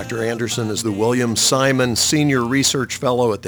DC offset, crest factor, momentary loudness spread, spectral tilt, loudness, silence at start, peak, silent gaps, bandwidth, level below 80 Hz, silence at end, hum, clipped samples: under 0.1%; 14 dB; 7 LU; -3.5 dB/octave; -17 LUFS; 0 s; -4 dBFS; none; over 20 kHz; -52 dBFS; 0 s; none; under 0.1%